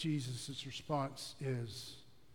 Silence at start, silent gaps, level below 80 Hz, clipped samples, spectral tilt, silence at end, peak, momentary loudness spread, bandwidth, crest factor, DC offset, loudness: 0 s; none; -70 dBFS; under 0.1%; -5 dB/octave; 0 s; -24 dBFS; 10 LU; 17.5 kHz; 18 dB; 0.1%; -42 LUFS